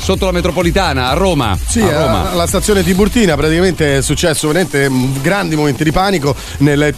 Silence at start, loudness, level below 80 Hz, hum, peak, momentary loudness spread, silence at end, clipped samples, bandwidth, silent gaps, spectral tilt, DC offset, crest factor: 0 s; -13 LUFS; -24 dBFS; none; 0 dBFS; 3 LU; 0 s; under 0.1%; 14 kHz; none; -5 dB/octave; under 0.1%; 12 dB